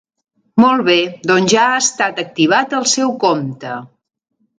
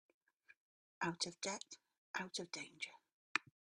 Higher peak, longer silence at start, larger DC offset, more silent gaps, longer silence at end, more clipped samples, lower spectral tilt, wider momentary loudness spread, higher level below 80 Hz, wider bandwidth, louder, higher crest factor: first, 0 dBFS vs -14 dBFS; about the same, 0.55 s vs 0.5 s; neither; second, none vs 0.57-1.01 s, 1.98-2.14 s, 3.13-3.35 s; first, 0.75 s vs 0.35 s; neither; about the same, -3 dB/octave vs -2 dB/octave; first, 11 LU vs 8 LU; first, -60 dBFS vs -86 dBFS; second, 9.6 kHz vs 12.5 kHz; first, -14 LUFS vs -45 LUFS; second, 16 dB vs 34 dB